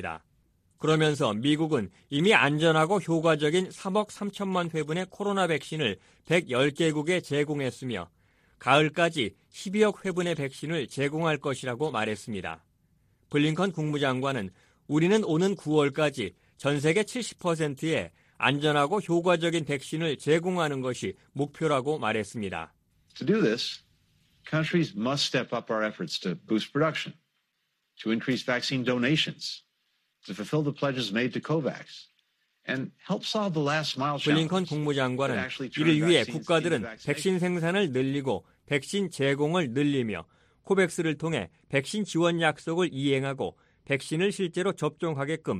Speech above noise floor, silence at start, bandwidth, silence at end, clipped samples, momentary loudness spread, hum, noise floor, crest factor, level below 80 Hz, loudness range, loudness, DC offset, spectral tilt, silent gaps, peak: 50 dB; 0 s; 13.5 kHz; 0 s; under 0.1%; 10 LU; none; -77 dBFS; 24 dB; -66 dBFS; 5 LU; -27 LUFS; under 0.1%; -5.5 dB/octave; none; -4 dBFS